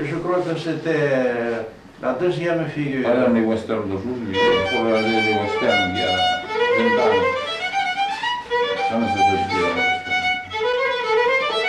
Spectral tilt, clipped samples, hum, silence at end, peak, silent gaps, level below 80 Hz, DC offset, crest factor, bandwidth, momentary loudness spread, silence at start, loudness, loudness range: -5 dB/octave; under 0.1%; none; 0 s; -8 dBFS; none; -54 dBFS; under 0.1%; 14 dB; 11 kHz; 7 LU; 0 s; -20 LUFS; 3 LU